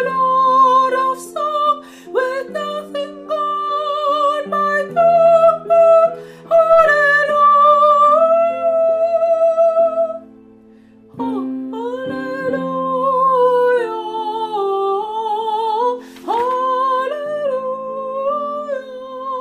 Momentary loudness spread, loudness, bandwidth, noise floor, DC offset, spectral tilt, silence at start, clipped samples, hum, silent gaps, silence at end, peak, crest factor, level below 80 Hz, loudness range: 14 LU; -16 LUFS; 12 kHz; -45 dBFS; under 0.1%; -4.5 dB/octave; 0 s; under 0.1%; none; none; 0 s; -2 dBFS; 14 dB; -60 dBFS; 9 LU